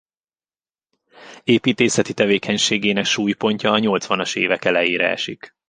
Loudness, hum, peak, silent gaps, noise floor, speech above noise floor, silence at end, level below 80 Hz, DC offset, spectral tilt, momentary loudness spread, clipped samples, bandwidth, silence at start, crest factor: -18 LUFS; none; -2 dBFS; none; under -90 dBFS; over 71 dB; 0.2 s; -60 dBFS; under 0.1%; -3.5 dB/octave; 3 LU; under 0.1%; 10 kHz; 1.2 s; 18 dB